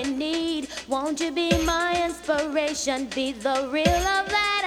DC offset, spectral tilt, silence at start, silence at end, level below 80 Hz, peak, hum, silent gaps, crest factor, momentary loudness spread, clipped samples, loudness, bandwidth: under 0.1%; -3.5 dB/octave; 0 s; 0 s; -40 dBFS; -6 dBFS; none; none; 18 dB; 6 LU; under 0.1%; -24 LUFS; 16 kHz